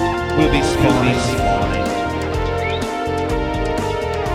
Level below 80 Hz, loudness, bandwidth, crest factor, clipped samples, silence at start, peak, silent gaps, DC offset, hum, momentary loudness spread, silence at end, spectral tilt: -28 dBFS; -18 LUFS; 16 kHz; 16 dB; under 0.1%; 0 s; -2 dBFS; none; under 0.1%; none; 6 LU; 0 s; -5.5 dB/octave